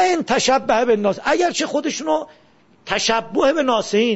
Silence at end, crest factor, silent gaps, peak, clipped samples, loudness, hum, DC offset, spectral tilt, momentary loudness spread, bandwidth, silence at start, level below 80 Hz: 0 s; 16 dB; none; -2 dBFS; under 0.1%; -18 LUFS; none; under 0.1%; -3 dB/octave; 6 LU; 8 kHz; 0 s; -54 dBFS